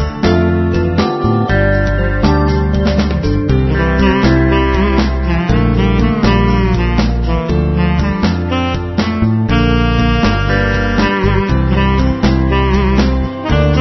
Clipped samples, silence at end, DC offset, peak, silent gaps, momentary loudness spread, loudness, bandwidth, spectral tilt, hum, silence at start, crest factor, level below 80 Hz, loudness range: under 0.1%; 0 s; under 0.1%; 0 dBFS; none; 3 LU; -13 LUFS; 6.2 kHz; -7.5 dB/octave; none; 0 s; 12 dB; -18 dBFS; 2 LU